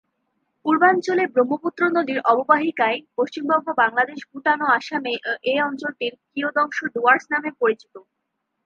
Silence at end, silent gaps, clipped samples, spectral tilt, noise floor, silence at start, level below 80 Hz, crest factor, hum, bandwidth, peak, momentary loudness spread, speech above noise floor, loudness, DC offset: 0.65 s; none; under 0.1%; -4.5 dB/octave; -77 dBFS; 0.65 s; -78 dBFS; 20 dB; none; 7.6 kHz; -2 dBFS; 9 LU; 56 dB; -21 LUFS; under 0.1%